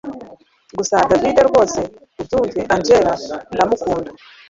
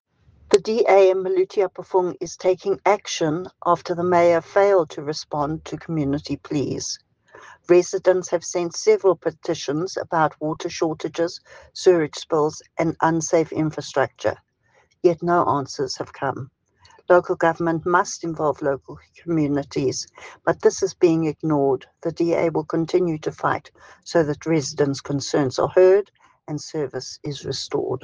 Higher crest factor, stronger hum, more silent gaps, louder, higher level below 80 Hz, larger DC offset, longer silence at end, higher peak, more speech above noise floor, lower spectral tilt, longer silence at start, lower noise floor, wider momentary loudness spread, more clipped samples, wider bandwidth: about the same, 16 dB vs 20 dB; neither; neither; first, -16 LUFS vs -22 LUFS; first, -44 dBFS vs -58 dBFS; neither; first, 0.35 s vs 0.05 s; about the same, 0 dBFS vs -2 dBFS; second, 27 dB vs 40 dB; about the same, -4.5 dB/octave vs -5.5 dB/octave; second, 0.05 s vs 0.5 s; second, -43 dBFS vs -61 dBFS; first, 17 LU vs 11 LU; neither; second, 7.8 kHz vs 10 kHz